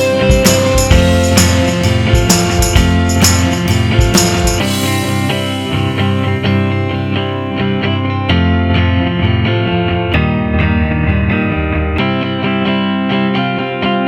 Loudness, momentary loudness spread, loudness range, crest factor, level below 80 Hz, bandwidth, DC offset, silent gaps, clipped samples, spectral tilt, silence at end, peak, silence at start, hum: -13 LUFS; 6 LU; 4 LU; 12 dB; -22 dBFS; 17.5 kHz; under 0.1%; none; 0.1%; -5 dB/octave; 0 s; 0 dBFS; 0 s; none